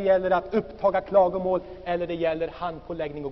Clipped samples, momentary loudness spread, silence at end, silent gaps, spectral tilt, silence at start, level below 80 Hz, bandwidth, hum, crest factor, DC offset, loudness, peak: under 0.1%; 11 LU; 0 s; none; -5 dB/octave; 0 s; -50 dBFS; 5.8 kHz; none; 16 dB; under 0.1%; -26 LUFS; -8 dBFS